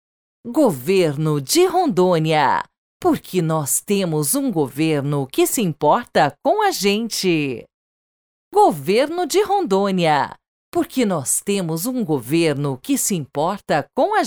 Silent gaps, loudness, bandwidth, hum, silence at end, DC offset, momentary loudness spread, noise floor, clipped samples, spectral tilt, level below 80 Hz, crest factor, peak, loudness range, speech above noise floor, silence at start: 2.78-3.00 s, 7.74-8.51 s, 10.48-10.72 s; -19 LUFS; over 20 kHz; none; 0 s; under 0.1%; 6 LU; under -90 dBFS; under 0.1%; -4.5 dB/octave; -60 dBFS; 16 dB; -4 dBFS; 2 LU; over 72 dB; 0.45 s